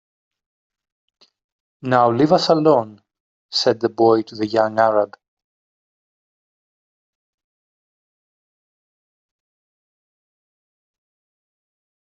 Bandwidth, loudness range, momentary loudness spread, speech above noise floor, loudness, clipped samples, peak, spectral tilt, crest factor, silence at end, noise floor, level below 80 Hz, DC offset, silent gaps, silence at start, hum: 8 kHz; 6 LU; 9 LU; over 73 dB; -17 LUFS; under 0.1%; -2 dBFS; -5.5 dB/octave; 22 dB; 7.05 s; under -90 dBFS; -66 dBFS; under 0.1%; 3.20-3.49 s; 1.85 s; none